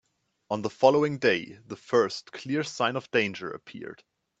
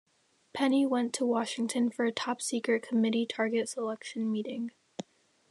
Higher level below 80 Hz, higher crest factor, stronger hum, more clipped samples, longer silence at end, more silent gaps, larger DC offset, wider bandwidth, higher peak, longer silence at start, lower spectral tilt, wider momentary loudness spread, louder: first, -72 dBFS vs -84 dBFS; first, 22 dB vs 16 dB; neither; neither; about the same, 0.45 s vs 0.5 s; neither; neither; second, 8.2 kHz vs 12.5 kHz; first, -6 dBFS vs -16 dBFS; about the same, 0.5 s vs 0.55 s; about the same, -5 dB/octave vs -4 dB/octave; first, 19 LU vs 13 LU; first, -26 LUFS vs -31 LUFS